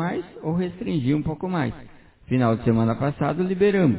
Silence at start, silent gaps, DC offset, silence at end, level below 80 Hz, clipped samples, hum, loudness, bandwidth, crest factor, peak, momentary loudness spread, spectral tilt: 0 s; none; under 0.1%; 0 s; -48 dBFS; under 0.1%; none; -24 LUFS; 4 kHz; 16 dB; -6 dBFS; 8 LU; -12 dB/octave